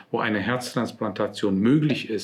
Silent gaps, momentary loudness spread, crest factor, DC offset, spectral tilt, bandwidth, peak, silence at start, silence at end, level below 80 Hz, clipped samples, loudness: none; 8 LU; 16 dB; under 0.1%; -6 dB/octave; 14.5 kHz; -8 dBFS; 0.1 s; 0 s; -68 dBFS; under 0.1%; -24 LUFS